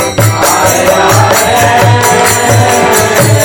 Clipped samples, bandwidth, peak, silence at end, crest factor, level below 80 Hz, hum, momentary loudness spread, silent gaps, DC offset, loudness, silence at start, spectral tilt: under 0.1%; 18.5 kHz; 0 dBFS; 0 s; 6 dB; -34 dBFS; none; 1 LU; none; under 0.1%; -6 LUFS; 0 s; -3.5 dB/octave